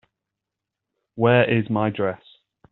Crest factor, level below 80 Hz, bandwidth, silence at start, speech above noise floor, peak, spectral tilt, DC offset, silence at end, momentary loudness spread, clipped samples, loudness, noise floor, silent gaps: 20 dB; -60 dBFS; 4.1 kHz; 1.15 s; 65 dB; -4 dBFS; -5.5 dB/octave; under 0.1%; 0.55 s; 18 LU; under 0.1%; -21 LUFS; -85 dBFS; none